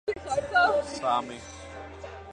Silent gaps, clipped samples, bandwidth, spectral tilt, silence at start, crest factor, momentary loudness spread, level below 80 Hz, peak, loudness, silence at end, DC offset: none; under 0.1%; 10.5 kHz; -3.5 dB/octave; 0.05 s; 18 dB; 19 LU; -52 dBFS; -12 dBFS; -26 LUFS; 0 s; under 0.1%